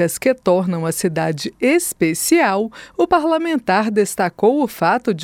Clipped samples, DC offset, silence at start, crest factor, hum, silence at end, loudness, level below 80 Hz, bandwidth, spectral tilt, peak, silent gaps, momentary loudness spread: under 0.1%; under 0.1%; 0 s; 16 dB; none; 0 s; -17 LUFS; -54 dBFS; 18 kHz; -4.5 dB/octave; -2 dBFS; none; 6 LU